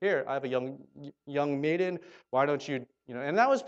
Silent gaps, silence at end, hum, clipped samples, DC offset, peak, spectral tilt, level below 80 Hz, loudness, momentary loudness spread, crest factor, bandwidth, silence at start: none; 0 s; none; under 0.1%; under 0.1%; -10 dBFS; -6 dB/octave; -80 dBFS; -31 LUFS; 15 LU; 20 dB; 8.2 kHz; 0 s